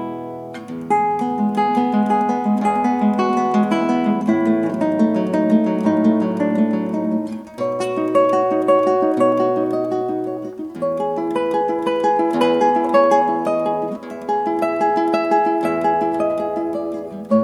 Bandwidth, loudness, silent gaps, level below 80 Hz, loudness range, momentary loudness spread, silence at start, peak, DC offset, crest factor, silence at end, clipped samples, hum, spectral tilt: 12 kHz; -18 LUFS; none; -64 dBFS; 2 LU; 9 LU; 0 s; -2 dBFS; under 0.1%; 16 dB; 0 s; under 0.1%; none; -7 dB/octave